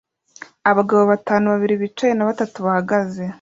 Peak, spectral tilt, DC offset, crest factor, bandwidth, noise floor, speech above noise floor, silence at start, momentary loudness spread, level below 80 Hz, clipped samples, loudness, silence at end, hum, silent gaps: -2 dBFS; -7 dB/octave; under 0.1%; 16 dB; 7.6 kHz; -43 dBFS; 25 dB; 0.65 s; 6 LU; -62 dBFS; under 0.1%; -18 LUFS; 0.05 s; none; none